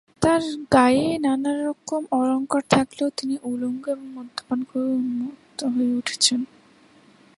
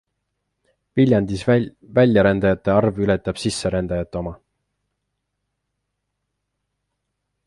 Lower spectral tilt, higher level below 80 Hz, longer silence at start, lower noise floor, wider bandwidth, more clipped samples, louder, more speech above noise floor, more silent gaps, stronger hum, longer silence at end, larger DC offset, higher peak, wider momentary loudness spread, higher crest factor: second, -4 dB/octave vs -6.5 dB/octave; second, -56 dBFS vs -44 dBFS; second, 0.2 s vs 0.95 s; second, -54 dBFS vs -77 dBFS; about the same, 11.5 kHz vs 11.5 kHz; neither; second, -23 LUFS vs -19 LUFS; second, 31 dB vs 59 dB; neither; second, none vs 50 Hz at -45 dBFS; second, 0.9 s vs 3.1 s; neither; about the same, -2 dBFS vs -2 dBFS; about the same, 11 LU vs 10 LU; about the same, 22 dB vs 18 dB